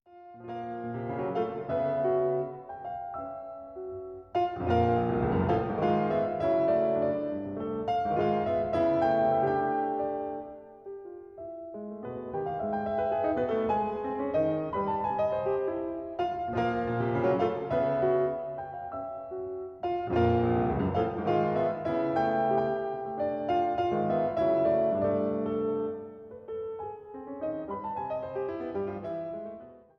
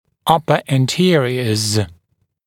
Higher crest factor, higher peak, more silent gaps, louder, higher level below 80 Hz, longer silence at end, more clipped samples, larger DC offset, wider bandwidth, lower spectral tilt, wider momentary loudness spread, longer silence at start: about the same, 16 dB vs 18 dB; second, -14 dBFS vs 0 dBFS; neither; second, -30 LUFS vs -16 LUFS; about the same, -54 dBFS vs -52 dBFS; second, 0.2 s vs 0.55 s; neither; neither; second, 6.2 kHz vs 17 kHz; first, -9 dB/octave vs -5 dB/octave; first, 14 LU vs 5 LU; second, 0.1 s vs 0.25 s